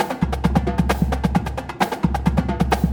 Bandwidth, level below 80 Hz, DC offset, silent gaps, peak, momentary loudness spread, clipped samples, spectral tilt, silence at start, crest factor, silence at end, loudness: over 20 kHz; -26 dBFS; under 0.1%; none; -4 dBFS; 4 LU; under 0.1%; -7 dB/octave; 0 s; 16 dB; 0 s; -21 LUFS